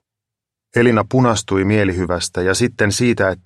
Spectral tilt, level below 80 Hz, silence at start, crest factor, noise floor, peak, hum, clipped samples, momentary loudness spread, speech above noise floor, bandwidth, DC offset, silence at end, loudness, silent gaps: -5 dB/octave; -44 dBFS; 0.75 s; 16 dB; -84 dBFS; -2 dBFS; none; under 0.1%; 5 LU; 68 dB; 13 kHz; under 0.1%; 0.1 s; -16 LUFS; none